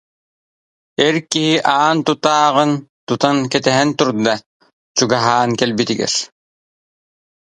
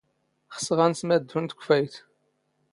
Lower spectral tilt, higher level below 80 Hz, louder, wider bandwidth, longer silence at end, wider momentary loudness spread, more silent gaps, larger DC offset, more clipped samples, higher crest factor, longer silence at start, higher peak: about the same, -4 dB/octave vs -5 dB/octave; first, -60 dBFS vs -72 dBFS; first, -16 LUFS vs -25 LUFS; about the same, 11 kHz vs 11.5 kHz; first, 1.2 s vs 0.75 s; second, 7 LU vs 11 LU; first, 2.89-3.07 s, 4.46-4.60 s, 4.73-4.95 s vs none; neither; neither; about the same, 18 dB vs 20 dB; first, 1 s vs 0.5 s; first, 0 dBFS vs -6 dBFS